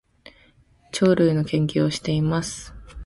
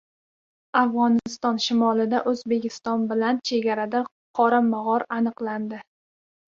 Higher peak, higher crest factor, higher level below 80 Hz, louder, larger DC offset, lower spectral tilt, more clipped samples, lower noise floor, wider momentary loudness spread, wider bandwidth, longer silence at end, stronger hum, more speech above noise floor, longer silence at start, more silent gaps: about the same, -6 dBFS vs -6 dBFS; about the same, 18 dB vs 18 dB; first, -46 dBFS vs -70 dBFS; about the same, -22 LUFS vs -23 LUFS; neither; about the same, -6 dB/octave vs -5 dB/octave; neither; second, -57 dBFS vs under -90 dBFS; first, 14 LU vs 9 LU; first, 11.5 kHz vs 7.4 kHz; second, 0 s vs 0.7 s; neither; second, 36 dB vs over 67 dB; first, 0.95 s vs 0.75 s; second, none vs 4.11-4.34 s